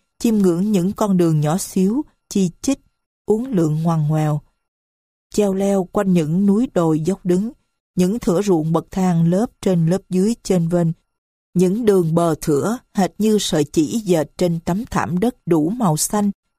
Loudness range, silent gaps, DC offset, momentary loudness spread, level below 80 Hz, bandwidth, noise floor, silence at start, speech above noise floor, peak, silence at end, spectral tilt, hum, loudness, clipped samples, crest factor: 2 LU; 3.06-3.25 s, 4.68-5.30 s, 7.80-7.94 s, 11.18-11.53 s; under 0.1%; 6 LU; -48 dBFS; 15.5 kHz; under -90 dBFS; 0.2 s; over 73 dB; -2 dBFS; 0.25 s; -6.5 dB/octave; none; -19 LUFS; under 0.1%; 16 dB